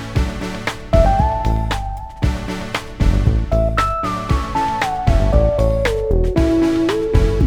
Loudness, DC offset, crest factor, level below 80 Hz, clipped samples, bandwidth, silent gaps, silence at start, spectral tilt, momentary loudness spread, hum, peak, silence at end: -18 LUFS; under 0.1%; 16 dB; -20 dBFS; under 0.1%; 13.5 kHz; none; 0 s; -7 dB/octave; 8 LU; none; 0 dBFS; 0 s